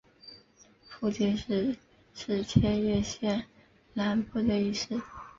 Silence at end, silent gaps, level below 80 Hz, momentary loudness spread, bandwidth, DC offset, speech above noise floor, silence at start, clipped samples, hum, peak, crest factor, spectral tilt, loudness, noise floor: 0.1 s; none; -50 dBFS; 23 LU; 7.6 kHz; under 0.1%; 31 dB; 0.25 s; under 0.1%; none; -8 dBFS; 22 dB; -6 dB/octave; -30 LUFS; -60 dBFS